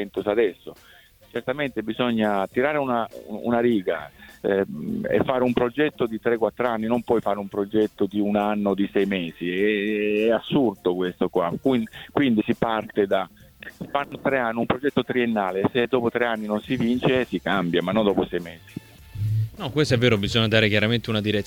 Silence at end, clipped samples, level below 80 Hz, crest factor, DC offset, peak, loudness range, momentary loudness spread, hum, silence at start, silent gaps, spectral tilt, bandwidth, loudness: 0 s; under 0.1%; -52 dBFS; 18 dB; under 0.1%; -6 dBFS; 2 LU; 8 LU; none; 0 s; none; -6.5 dB/octave; 18.5 kHz; -23 LUFS